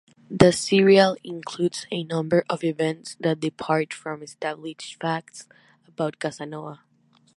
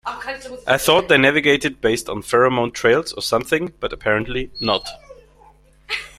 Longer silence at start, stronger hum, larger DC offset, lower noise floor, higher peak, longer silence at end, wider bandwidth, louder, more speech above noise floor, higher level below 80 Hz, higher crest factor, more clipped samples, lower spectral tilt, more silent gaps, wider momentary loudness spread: first, 0.3 s vs 0.05 s; neither; neither; first, -61 dBFS vs -50 dBFS; about the same, 0 dBFS vs 0 dBFS; first, 0.6 s vs 0.1 s; second, 11.5 kHz vs 15.5 kHz; second, -23 LUFS vs -18 LUFS; first, 38 dB vs 31 dB; second, -58 dBFS vs -44 dBFS; first, 24 dB vs 18 dB; neither; first, -5.5 dB/octave vs -4 dB/octave; neither; first, 18 LU vs 13 LU